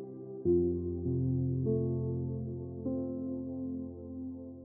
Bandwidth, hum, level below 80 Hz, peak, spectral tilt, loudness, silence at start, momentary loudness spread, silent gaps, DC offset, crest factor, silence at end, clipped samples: 1.4 kHz; none; -54 dBFS; -18 dBFS; -16.5 dB/octave; -35 LUFS; 0 s; 12 LU; none; under 0.1%; 16 dB; 0 s; under 0.1%